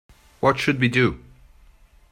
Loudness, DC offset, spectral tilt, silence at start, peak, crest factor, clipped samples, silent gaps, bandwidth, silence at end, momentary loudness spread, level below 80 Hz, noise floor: -21 LUFS; under 0.1%; -6 dB/octave; 0.4 s; -4 dBFS; 20 dB; under 0.1%; none; 14.5 kHz; 0.95 s; 4 LU; -48 dBFS; -52 dBFS